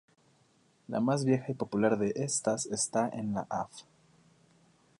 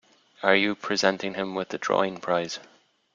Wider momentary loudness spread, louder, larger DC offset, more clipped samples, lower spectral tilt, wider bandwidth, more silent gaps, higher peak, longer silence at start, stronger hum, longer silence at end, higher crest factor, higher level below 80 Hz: about the same, 9 LU vs 9 LU; second, -31 LUFS vs -26 LUFS; neither; neither; about the same, -5 dB/octave vs -4 dB/octave; first, 11.5 kHz vs 7.6 kHz; neither; second, -14 dBFS vs -4 dBFS; first, 0.9 s vs 0.4 s; neither; first, 1.2 s vs 0.5 s; about the same, 20 dB vs 24 dB; about the same, -70 dBFS vs -68 dBFS